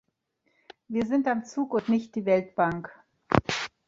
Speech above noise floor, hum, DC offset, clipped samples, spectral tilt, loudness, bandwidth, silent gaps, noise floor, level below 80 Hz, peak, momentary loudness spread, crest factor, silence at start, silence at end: 48 dB; none; under 0.1%; under 0.1%; -6 dB/octave; -27 LUFS; 7.8 kHz; none; -74 dBFS; -54 dBFS; -2 dBFS; 6 LU; 26 dB; 0.9 s; 0.2 s